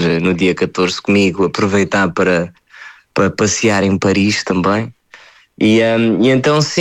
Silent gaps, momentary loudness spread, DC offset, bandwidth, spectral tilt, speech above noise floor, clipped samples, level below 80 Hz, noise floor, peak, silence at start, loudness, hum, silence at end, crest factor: none; 5 LU; under 0.1%; 11 kHz; -5 dB/octave; 30 dB; under 0.1%; -48 dBFS; -43 dBFS; -2 dBFS; 0 s; -14 LUFS; none; 0 s; 12 dB